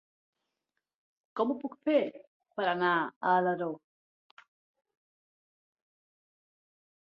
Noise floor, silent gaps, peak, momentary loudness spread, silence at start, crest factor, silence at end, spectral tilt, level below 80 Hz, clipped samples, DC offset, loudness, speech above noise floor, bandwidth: -86 dBFS; 2.27-2.40 s, 3.16-3.21 s; -14 dBFS; 13 LU; 1.35 s; 22 dB; 3.4 s; -3.5 dB/octave; -84 dBFS; under 0.1%; under 0.1%; -30 LUFS; 57 dB; 5.8 kHz